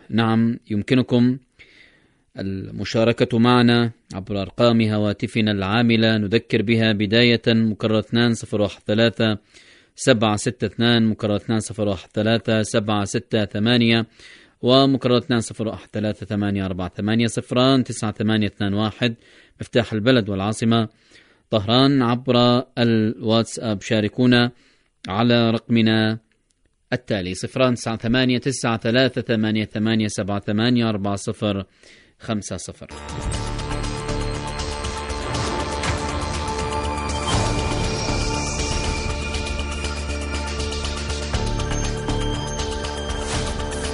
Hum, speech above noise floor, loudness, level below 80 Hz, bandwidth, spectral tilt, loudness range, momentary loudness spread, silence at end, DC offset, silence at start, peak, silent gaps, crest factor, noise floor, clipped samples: none; 45 dB; -21 LUFS; -36 dBFS; 11 kHz; -5.5 dB/octave; 7 LU; 10 LU; 0 s; under 0.1%; 0.1 s; 0 dBFS; none; 20 dB; -65 dBFS; under 0.1%